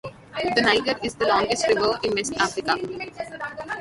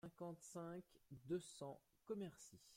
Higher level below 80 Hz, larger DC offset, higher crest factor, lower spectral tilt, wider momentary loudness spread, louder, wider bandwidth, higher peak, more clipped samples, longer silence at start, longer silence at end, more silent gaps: first, -54 dBFS vs -84 dBFS; neither; about the same, 20 dB vs 18 dB; second, -3 dB/octave vs -5.5 dB/octave; about the same, 13 LU vs 13 LU; first, -23 LUFS vs -53 LUFS; second, 11.5 kHz vs 16.5 kHz; first, -4 dBFS vs -36 dBFS; neither; about the same, 0.05 s vs 0.05 s; about the same, 0 s vs 0 s; neither